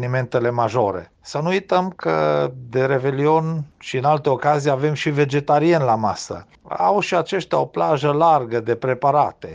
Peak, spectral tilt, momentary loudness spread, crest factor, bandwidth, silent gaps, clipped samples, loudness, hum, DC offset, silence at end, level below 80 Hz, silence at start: -4 dBFS; -6.5 dB/octave; 9 LU; 16 dB; 9.6 kHz; none; under 0.1%; -19 LUFS; none; under 0.1%; 0 s; -58 dBFS; 0 s